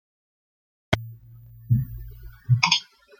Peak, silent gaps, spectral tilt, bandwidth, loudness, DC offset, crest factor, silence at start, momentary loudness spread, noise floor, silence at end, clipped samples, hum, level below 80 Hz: -2 dBFS; none; -4 dB/octave; 15.5 kHz; -23 LUFS; under 0.1%; 26 dB; 0.9 s; 23 LU; -47 dBFS; 0.35 s; under 0.1%; none; -46 dBFS